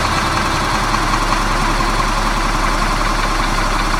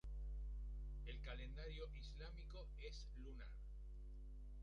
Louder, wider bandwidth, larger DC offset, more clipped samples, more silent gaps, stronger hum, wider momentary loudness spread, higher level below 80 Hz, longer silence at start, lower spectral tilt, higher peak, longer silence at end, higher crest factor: first, -16 LUFS vs -55 LUFS; first, 15.5 kHz vs 7 kHz; neither; neither; neither; second, none vs 50 Hz at -50 dBFS; second, 1 LU vs 6 LU; first, -20 dBFS vs -52 dBFS; about the same, 0 s vs 0.05 s; second, -3.5 dB/octave vs -5.5 dB/octave; first, -2 dBFS vs -40 dBFS; about the same, 0 s vs 0 s; about the same, 14 dB vs 12 dB